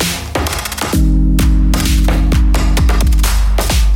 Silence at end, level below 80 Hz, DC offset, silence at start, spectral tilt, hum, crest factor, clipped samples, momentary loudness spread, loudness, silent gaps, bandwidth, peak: 0 s; -12 dBFS; under 0.1%; 0 s; -5 dB/octave; none; 10 dB; under 0.1%; 5 LU; -14 LUFS; none; 17 kHz; -2 dBFS